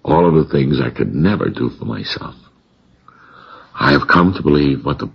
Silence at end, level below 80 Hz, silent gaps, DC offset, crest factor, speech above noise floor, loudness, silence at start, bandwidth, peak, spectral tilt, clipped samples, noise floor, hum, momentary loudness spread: 0.05 s; -38 dBFS; none; under 0.1%; 16 dB; 39 dB; -15 LUFS; 0.05 s; 6.6 kHz; 0 dBFS; -8.5 dB/octave; under 0.1%; -54 dBFS; none; 12 LU